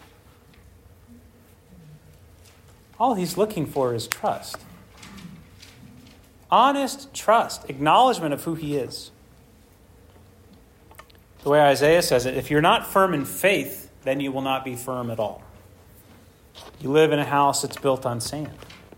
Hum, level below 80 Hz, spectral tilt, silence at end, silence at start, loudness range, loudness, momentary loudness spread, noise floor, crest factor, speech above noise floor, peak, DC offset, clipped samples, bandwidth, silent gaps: none; -54 dBFS; -4.5 dB/octave; 0.2 s; 1.85 s; 9 LU; -22 LUFS; 19 LU; -53 dBFS; 24 dB; 31 dB; 0 dBFS; under 0.1%; under 0.1%; 16.5 kHz; none